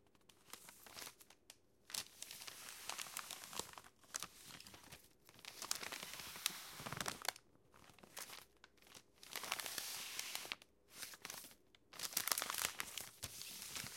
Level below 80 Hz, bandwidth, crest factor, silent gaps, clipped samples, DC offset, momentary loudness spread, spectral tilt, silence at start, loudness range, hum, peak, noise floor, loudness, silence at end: -78 dBFS; 17 kHz; 34 dB; none; under 0.1%; under 0.1%; 20 LU; 0 dB/octave; 0.3 s; 6 LU; none; -16 dBFS; -70 dBFS; -46 LUFS; 0 s